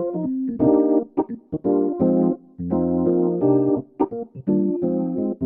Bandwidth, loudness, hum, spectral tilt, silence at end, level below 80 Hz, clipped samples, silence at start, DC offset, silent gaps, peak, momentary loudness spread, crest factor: 2.5 kHz; -21 LUFS; none; -14.5 dB/octave; 0 s; -54 dBFS; under 0.1%; 0 s; under 0.1%; none; -6 dBFS; 8 LU; 14 dB